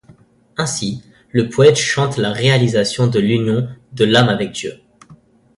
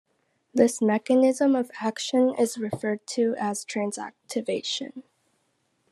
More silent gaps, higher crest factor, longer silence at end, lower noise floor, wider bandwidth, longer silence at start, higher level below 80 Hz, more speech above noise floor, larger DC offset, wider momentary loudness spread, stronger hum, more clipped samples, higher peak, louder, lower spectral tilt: neither; second, 16 dB vs 22 dB; second, 0.45 s vs 0.9 s; second, -48 dBFS vs -72 dBFS; second, 11.5 kHz vs 13 kHz; about the same, 0.6 s vs 0.55 s; first, -50 dBFS vs -76 dBFS; second, 33 dB vs 47 dB; neither; first, 14 LU vs 11 LU; neither; neither; first, 0 dBFS vs -4 dBFS; first, -16 LUFS vs -25 LUFS; about the same, -5 dB/octave vs -4 dB/octave